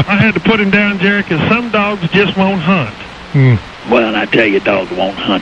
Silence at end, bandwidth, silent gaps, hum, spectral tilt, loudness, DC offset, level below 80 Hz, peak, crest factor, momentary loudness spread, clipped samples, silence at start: 0 s; 8.2 kHz; none; none; -7.5 dB/octave; -12 LUFS; under 0.1%; -40 dBFS; 0 dBFS; 12 dB; 6 LU; under 0.1%; 0 s